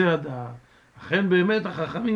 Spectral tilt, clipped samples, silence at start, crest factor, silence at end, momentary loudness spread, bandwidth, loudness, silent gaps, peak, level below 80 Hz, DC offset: -8 dB/octave; under 0.1%; 0 s; 16 dB; 0 s; 17 LU; 7.2 kHz; -24 LUFS; none; -8 dBFS; -62 dBFS; under 0.1%